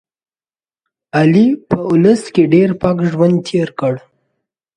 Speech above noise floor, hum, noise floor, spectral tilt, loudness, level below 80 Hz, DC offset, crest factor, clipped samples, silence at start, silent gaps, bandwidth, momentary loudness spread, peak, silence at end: over 78 dB; none; under -90 dBFS; -7.5 dB/octave; -13 LUFS; -50 dBFS; under 0.1%; 14 dB; under 0.1%; 1.15 s; none; 10 kHz; 9 LU; 0 dBFS; 0.8 s